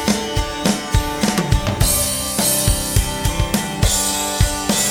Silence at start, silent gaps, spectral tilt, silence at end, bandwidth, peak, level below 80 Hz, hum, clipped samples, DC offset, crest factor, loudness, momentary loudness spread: 0 s; none; -3.5 dB/octave; 0 s; 19 kHz; 0 dBFS; -24 dBFS; none; under 0.1%; under 0.1%; 18 dB; -18 LUFS; 5 LU